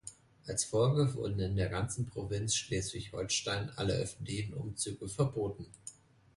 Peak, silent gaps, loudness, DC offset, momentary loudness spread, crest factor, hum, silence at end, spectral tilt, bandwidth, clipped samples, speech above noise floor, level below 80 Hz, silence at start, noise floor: -18 dBFS; none; -35 LUFS; under 0.1%; 11 LU; 18 dB; none; 0.45 s; -4.5 dB/octave; 11.5 kHz; under 0.1%; 20 dB; -54 dBFS; 0.05 s; -54 dBFS